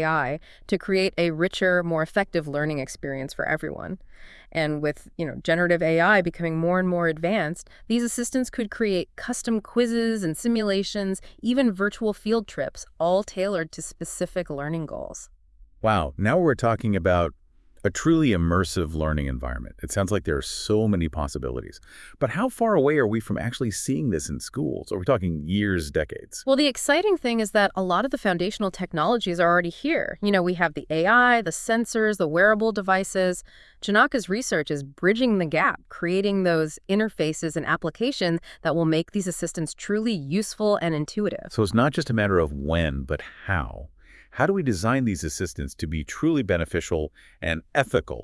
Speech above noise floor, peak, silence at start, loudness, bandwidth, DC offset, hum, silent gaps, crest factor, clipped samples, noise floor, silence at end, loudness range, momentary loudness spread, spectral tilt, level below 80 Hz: 28 dB; -4 dBFS; 0 s; -24 LUFS; 12 kHz; under 0.1%; none; none; 20 dB; under 0.1%; -52 dBFS; 0 s; 5 LU; 10 LU; -5 dB/octave; -44 dBFS